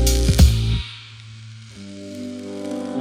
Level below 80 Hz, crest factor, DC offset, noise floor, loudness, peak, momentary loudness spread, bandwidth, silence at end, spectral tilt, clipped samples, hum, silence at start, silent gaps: -24 dBFS; 18 dB; under 0.1%; -39 dBFS; -20 LUFS; -2 dBFS; 24 LU; 16 kHz; 0 s; -5 dB/octave; under 0.1%; none; 0 s; none